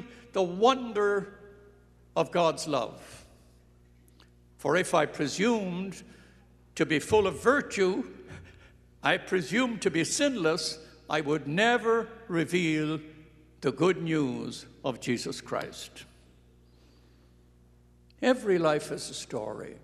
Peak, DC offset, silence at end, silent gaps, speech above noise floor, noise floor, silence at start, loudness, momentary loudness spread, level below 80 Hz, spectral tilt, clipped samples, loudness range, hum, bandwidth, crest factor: -8 dBFS; under 0.1%; 0.05 s; none; 31 dB; -59 dBFS; 0 s; -28 LUFS; 15 LU; -62 dBFS; -4.5 dB/octave; under 0.1%; 6 LU; 60 Hz at -55 dBFS; 13 kHz; 22 dB